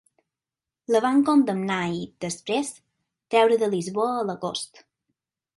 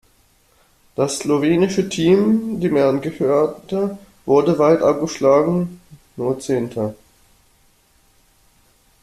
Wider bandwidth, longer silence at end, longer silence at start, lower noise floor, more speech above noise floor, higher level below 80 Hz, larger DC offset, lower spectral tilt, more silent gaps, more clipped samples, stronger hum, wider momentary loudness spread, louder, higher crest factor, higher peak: second, 11.5 kHz vs 14 kHz; second, 0.9 s vs 2.1 s; about the same, 0.9 s vs 1 s; first, -90 dBFS vs -57 dBFS; first, 67 dB vs 40 dB; second, -68 dBFS vs -54 dBFS; neither; about the same, -5 dB/octave vs -6 dB/octave; neither; neither; neither; about the same, 13 LU vs 11 LU; second, -24 LUFS vs -18 LUFS; about the same, 18 dB vs 16 dB; second, -8 dBFS vs -2 dBFS